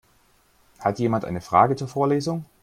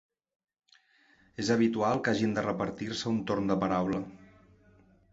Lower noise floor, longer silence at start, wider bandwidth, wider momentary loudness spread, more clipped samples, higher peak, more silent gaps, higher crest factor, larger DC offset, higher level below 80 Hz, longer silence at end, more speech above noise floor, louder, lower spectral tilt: second, -61 dBFS vs -65 dBFS; second, 0.8 s vs 1.4 s; first, 15.5 kHz vs 8 kHz; about the same, 8 LU vs 8 LU; neither; first, -4 dBFS vs -12 dBFS; neither; about the same, 20 dB vs 18 dB; neither; about the same, -58 dBFS vs -62 dBFS; second, 0.2 s vs 0.9 s; about the same, 38 dB vs 35 dB; first, -23 LUFS vs -30 LUFS; first, -7 dB/octave vs -5.5 dB/octave